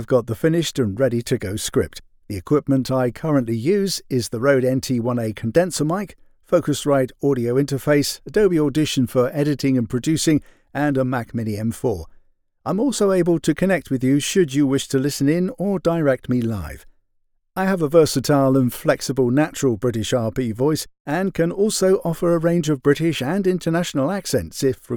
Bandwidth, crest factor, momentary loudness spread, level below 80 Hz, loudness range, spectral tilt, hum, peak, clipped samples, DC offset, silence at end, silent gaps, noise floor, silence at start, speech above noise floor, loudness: over 20 kHz; 16 dB; 6 LU; -48 dBFS; 2 LU; -5.5 dB/octave; none; -4 dBFS; under 0.1%; under 0.1%; 0 s; 21.00-21.05 s; -65 dBFS; 0 s; 46 dB; -20 LUFS